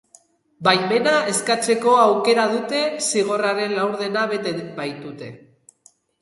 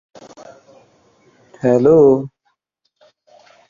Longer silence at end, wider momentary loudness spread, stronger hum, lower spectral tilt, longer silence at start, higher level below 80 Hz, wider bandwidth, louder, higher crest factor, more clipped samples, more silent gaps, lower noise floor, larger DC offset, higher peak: second, 0.85 s vs 1.4 s; about the same, 14 LU vs 12 LU; neither; second, -3 dB/octave vs -9 dB/octave; second, 0.6 s vs 1.65 s; second, -70 dBFS vs -56 dBFS; first, 12 kHz vs 7.4 kHz; second, -19 LUFS vs -13 LUFS; about the same, 20 dB vs 18 dB; neither; neither; second, -57 dBFS vs -71 dBFS; neither; about the same, -2 dBFS vs 0 dBFS